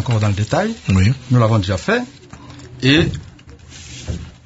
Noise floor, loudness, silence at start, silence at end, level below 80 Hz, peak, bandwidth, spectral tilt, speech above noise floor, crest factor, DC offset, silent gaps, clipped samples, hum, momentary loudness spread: -39 dBFS; -17 LUFS; 0 s; 0.15 s; -34 dBFS; 0 dBFS; 8 kHz; -6 dB/octave; 24 dB; 18 dB; under 0.1%; none; under 0.1%; none; 21 LU